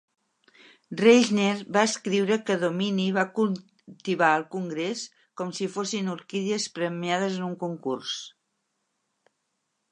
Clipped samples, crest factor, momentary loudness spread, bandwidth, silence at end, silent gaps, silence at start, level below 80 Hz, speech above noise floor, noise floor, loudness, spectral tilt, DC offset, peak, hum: under 0.1%; 22 dB; 13 LU; 10.5 kHz; 1.65 s; none; 0.9 s; -78 dBFS; 52 dB; -78 dBFS; -26 LUFS; -4.5 dB/octave; under 0.1%; -4 dBFS; none